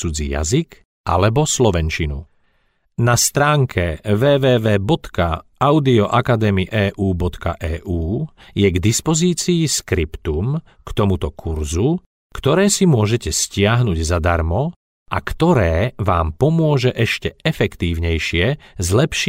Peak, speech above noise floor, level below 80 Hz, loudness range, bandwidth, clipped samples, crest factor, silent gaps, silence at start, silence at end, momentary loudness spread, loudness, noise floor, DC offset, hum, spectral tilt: -4 dBFS; 45 dB; -32 dBFS; 3 LU; 16 kHz; under 0.1%; 14 dB; 0.85-1.04 s, 12.06-12.30 s, 14.76-15.06 s; 0 s; 0 s; 10 LU; -18 LUFS; -62 dBFS; under 0.1%; none; -5 dB/octave